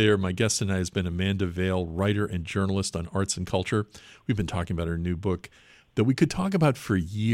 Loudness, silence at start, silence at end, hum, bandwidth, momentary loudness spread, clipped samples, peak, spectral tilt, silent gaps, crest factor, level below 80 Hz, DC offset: -27 LUFS; 0 s; 0 s; none; 14.5 kHz; 6 LU; under 0.1%; -8 dBFS; -5.5 dB/octave; none; 18 dB; -46 dBFS; under 0.1%